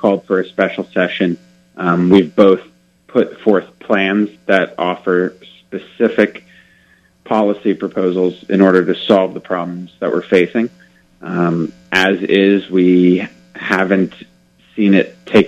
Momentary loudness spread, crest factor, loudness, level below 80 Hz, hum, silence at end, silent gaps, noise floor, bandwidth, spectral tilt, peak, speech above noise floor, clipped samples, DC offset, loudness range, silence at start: 11 LU; 14 dB; -15 LUFS; -58 dBFS; none; 0 s; none; -52 dBFS; 8.8 kHz; -7 dB/octave; 0 dBFS; 38 dB; 0.1%; under 0.1%; 4 LU; 0 s